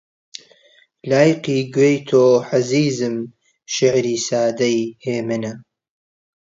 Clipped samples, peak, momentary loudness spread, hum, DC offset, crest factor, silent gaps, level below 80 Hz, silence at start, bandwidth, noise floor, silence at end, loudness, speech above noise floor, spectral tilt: under 0.1%; 0 dBFS; 19 LU; none; under 0.1%; 18 dB; none; -64 dBFS; 1.05 s; 7.8 kHz; -55 dBFS; 0.85 s; -18 LUFS; 37 dB; -5 dB/octave